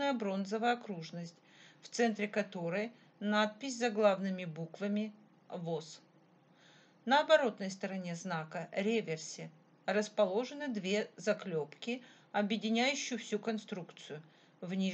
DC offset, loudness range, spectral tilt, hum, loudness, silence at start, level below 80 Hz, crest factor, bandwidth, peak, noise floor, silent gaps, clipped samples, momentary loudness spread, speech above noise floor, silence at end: under 0.1%; 3 LU; -4.5 dB/octave; none; -36 LUFS; 0 s; under -90 dBFS; 22 dB; 8.8 kHz; -14 dBFS; -66 dBFS; none; under 0.1%; 15 LU; 30 dB; 0 s